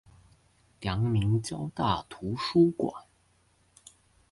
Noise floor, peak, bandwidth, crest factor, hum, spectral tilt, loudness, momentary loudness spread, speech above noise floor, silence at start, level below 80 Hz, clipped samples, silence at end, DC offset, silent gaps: -67 dBFS; -12 dBFS; 11.5 kHz; 18 dB; none; -7 dB/octave; -29 LUFS; 12 LU; 39 dB; 0.8 s; -52 dBFS; under 0.1%; 1.3 s; under 0.1%; none